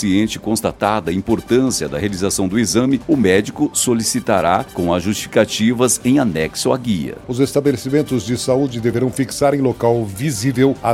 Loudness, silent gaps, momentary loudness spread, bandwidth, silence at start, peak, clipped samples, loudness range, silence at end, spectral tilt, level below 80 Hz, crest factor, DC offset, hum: -17 LUFS; none; 5 LU; 16.5 kHz; 0 s; 0 dBFS; under 0.1%; 2 LU; 0 s; -5 dB/octave; -44 dBFS; 16 dB; under 0.1%; none